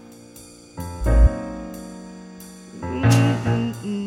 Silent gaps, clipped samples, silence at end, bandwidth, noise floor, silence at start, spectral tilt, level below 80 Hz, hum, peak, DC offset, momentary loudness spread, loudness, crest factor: none; under 0.1%; 0 s; 15.5 kHz; -44 dBFS; 0.05 s; -6.5 dB/octave; -26 dBFS; none; -4 dBFS; under 0.1%; 23 LU; -21 LUFS; 18 dB